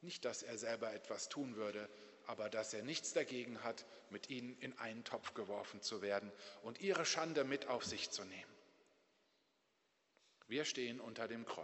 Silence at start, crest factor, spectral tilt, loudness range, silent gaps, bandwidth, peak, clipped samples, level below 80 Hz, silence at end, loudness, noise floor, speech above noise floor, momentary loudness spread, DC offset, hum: 0 s; 22 dB; -2.5 dB/octave; 6 LU; none; 8.2 kHz; -24 dBFS; under 0.1%; -88 dBFS; 0 s; -44 LUFS; -81 dBFS; 36 dB; 13 LU; under 0.1%; none